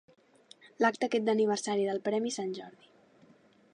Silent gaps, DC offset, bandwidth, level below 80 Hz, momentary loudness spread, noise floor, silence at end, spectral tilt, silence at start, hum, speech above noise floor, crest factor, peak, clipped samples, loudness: none; under 0.1%; 11 kHz; -84 dBFS; 11 LU; -62 dBFS; 1.05 s; -4 dB/octave; 0.65 s; none; 32 dB; 20 dB; -14 dBFS; under 0.1%; -30 LUFS